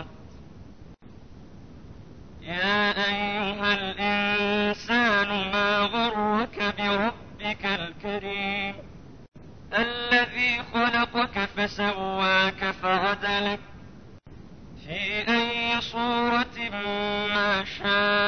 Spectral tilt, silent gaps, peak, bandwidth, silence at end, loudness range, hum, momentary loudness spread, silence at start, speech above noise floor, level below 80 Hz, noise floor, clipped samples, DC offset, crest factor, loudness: -4.5 dB/octave; none; -10 dBFS; 6.6 kHz; 0 s; 5 LU; none; 8 LU; 0 s; 22 dB; -52 dBFS; -47 dBFS; under 0.1%; 0.3%; 18 dB; -25 LUFS